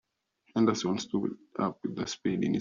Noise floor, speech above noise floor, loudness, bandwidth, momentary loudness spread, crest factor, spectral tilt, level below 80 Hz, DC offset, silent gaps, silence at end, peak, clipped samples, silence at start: -71 dBFS; 40 dB; -31 LUFS; 7.4 kHz; 9 LU; 20 dB; -5.5 dB/octave; -68 dBFS; under 0.1%; none; 0 s; -12 dBFS; under 0.1%; 0.55 s